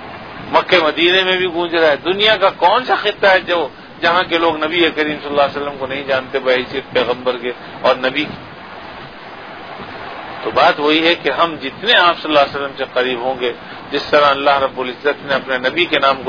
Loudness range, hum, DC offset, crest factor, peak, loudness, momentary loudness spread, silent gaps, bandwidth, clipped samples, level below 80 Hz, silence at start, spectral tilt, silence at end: 6 LU; none; 0.3%; 16 dB; 0 dBFS; -15 LUFS; 17 LU; none; 5.4 kHz; under 0.1%; -52 dBFS; 0 s; -5 dB/octave; 0 s